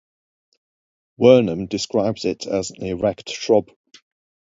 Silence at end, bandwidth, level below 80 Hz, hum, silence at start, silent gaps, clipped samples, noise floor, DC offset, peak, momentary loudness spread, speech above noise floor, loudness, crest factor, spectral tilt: 0.9 s; 7.8 kHz; -52 dBFS; none; 1.2 s; none; under 0.1%; under -90 dBFS; under 0.1%; 0 dBFS; 11 LU; over 71 dB; -20 LUFS; 20 dB; -5.5 dB/octave